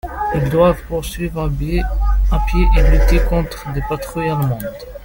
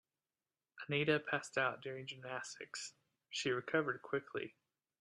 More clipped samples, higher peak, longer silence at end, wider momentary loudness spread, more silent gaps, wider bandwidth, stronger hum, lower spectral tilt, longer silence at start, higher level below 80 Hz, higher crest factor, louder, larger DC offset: neither; first, -2 dBFS vs -20 dBFS; second, 0 s vs 0.5 s; about the same, 10 LU vs 12 LU; neither; first, 17 kHz vs 12 kHz; neither; first, -7 dB/octave vs -4 dB/octave; second, 0.05 s vs 0.75 s; first, -18 dBFS vs -82 dBFS; second, 14 dB vs 22 dB; first, -18 LUFS vs -40 LUFS; neither